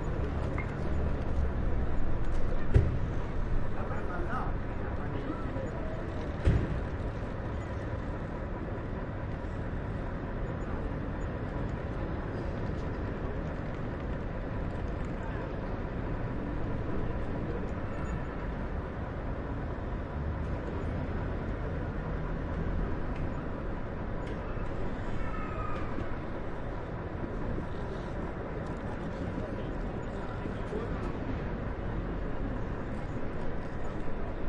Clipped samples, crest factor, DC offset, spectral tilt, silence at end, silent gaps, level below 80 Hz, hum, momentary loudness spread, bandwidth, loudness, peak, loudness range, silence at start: under 0.1%; 22 dB; under 0.1%; -8.5 dB/octave; 0 s; none; -38 dBFS; none; 4 LU; 7.4 kHz; -36 LUFS; -12 dBFS; 4 LU; 0 s